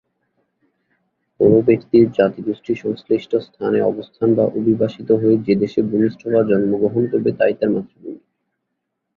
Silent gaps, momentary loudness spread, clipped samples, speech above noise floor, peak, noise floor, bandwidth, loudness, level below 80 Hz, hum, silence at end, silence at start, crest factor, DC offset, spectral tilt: none; 9 LU; under 0.1%; 59 dB; -2 dBFS; -76 dBFS; 6.4 kHz; -18 LUFS; -56 dBFS; none; 1 s; 1.4 s; 16 dB; under 0.1%; -9.5 dB/octave